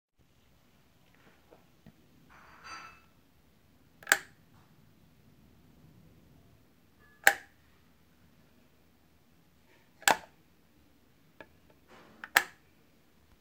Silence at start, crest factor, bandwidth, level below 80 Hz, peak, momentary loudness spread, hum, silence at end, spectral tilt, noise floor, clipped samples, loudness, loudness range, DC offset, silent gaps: 2.65 s; 38 dB; 16 kHz; -72 dBFS; 0 dBFS; 30 LU; none; 0.95 s; 0 dB/octave; -67 dBFS; under 0.1%; -29 LUFS; 20 LU; under 0.1%; none